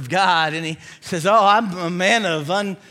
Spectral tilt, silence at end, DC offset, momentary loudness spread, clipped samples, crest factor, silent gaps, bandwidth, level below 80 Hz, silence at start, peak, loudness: -4 dB/octave; 0.15 s; under 0.1%; 13 LU; under 0.1%; 16 dB; none; 15.5 kHz; -66 dBFS; 0 s; -2 dBFS; -18 LUFS